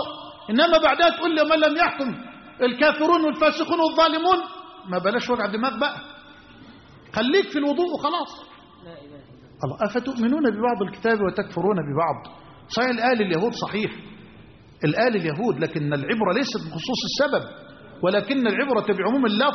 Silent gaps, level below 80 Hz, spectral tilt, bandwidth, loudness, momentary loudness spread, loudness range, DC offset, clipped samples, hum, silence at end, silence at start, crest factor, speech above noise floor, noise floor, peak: none; -58 dBFS; -3 dB/octave; 6.4 kHz; -22 LUFS; 12 LU; 6 LU; under 0.1%; under 0.1%; none; 0 s; 0 s; 16 dB; 26 dB; -48 dBFS; -6 dBFS